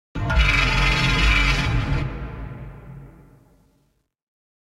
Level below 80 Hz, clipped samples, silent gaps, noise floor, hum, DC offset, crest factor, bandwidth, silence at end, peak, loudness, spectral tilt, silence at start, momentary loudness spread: -26 dBFS; under 0.1%; none; -66 dBFS; none; under 0.1%; 18 dB; 12.5 kHz; 1.6 s; -6 dBFS; -20 LUFS; -4.5 dB/octave; 0.15 s; 21 LU